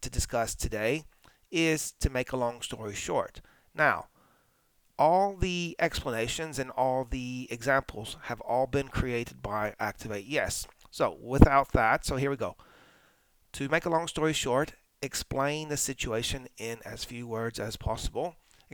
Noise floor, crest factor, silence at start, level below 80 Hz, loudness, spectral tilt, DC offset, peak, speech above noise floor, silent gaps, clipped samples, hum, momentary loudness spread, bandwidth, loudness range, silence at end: -68 dBFS; 30 dB; 0 s; -40 dBFS; -30 LUFS; -4.5 dB/octave; under 0.1%; 0 dBFS; 39 dB; none; under 0.1%; none; 12 LU; over 20 kHz; 5 LU; 0.4 s